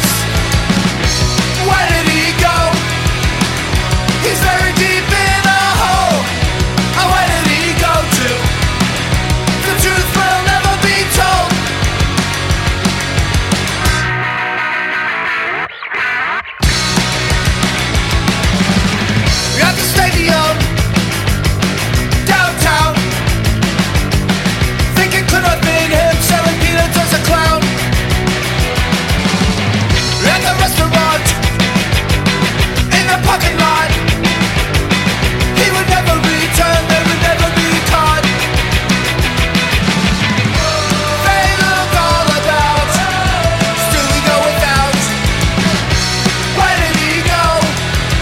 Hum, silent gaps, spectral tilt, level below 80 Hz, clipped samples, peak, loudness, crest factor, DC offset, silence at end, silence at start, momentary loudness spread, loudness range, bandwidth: none; none; -4 dB/octave; -22 dBFS; under 0.1%; 0 dBFS; -12 LUFS; 12 dB; under 0.1%; 0 s; 0 s; 3 LU; 2 LU; 16.5 kHz